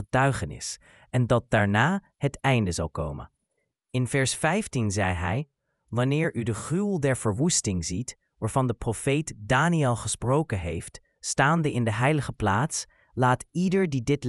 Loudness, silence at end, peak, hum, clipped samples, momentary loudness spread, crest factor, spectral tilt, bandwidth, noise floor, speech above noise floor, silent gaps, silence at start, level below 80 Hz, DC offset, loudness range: -26 LUFS; 0 s; -6 dBFS; none; under 0.1%; 11 LU; 20 dB; -5 dB/octave; 12 kHz; -78 dBFS; 53 dB; none; 0 s; -48 dBFS; under 0.1%; 2 LU